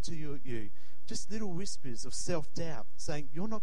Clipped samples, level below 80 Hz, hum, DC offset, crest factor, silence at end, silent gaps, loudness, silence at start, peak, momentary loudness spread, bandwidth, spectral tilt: under 0.1%; -54 dBFS; none; 7%; 18 dB; 0 s; none; -40 LUFS; 0 s; -16 dBFS; 7 LU; 16 kHz; -4.5 dB/octave